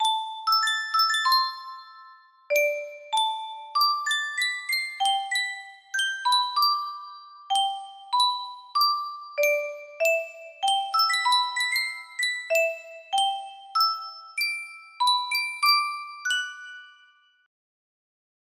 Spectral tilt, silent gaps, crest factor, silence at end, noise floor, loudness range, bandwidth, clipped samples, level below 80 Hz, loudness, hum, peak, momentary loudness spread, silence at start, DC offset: 3.5 dB/octave; none; 18 dB; 1.55 s; -59 dBFS; 2 LU; 16 kHz; under 0.1%; -82 dBFS; -24 LUFS; none; -8 dBFS; 14 LU; 0 s; under 0.1%